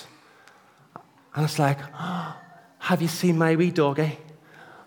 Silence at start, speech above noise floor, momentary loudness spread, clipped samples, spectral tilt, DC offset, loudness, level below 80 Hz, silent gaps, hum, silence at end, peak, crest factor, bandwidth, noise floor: 0 s; 32 dB; 15 LU; under 0.1%; -6 dB/octave; under 0.1%; -24 LUFS; -76 dBFS; none; none; 0.05 s; -8 dBFS; 20 dB; 19.5 kHz; -55 dBFS